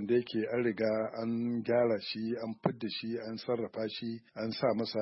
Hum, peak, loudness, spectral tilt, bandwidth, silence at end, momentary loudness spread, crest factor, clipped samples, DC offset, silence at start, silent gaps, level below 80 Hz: none; -12 dBFS; -34 LUFS; -9.5 dB/octave; 5.8 kHz; 0 s; 8 LU; 22 dB; under 0.1%; under 0.1%; 0 s; none; -76 dBFS